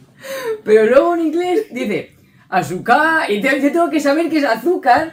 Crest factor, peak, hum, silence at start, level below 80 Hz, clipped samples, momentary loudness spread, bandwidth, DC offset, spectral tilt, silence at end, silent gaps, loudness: 14 dB; 0 dBFS; none; 0.25 s; -56 dBFS; under 0.1%; 10 LU; 16.5 kHz; under 0.1%; -5 dB/octave; 0 s; none; -15 LUFS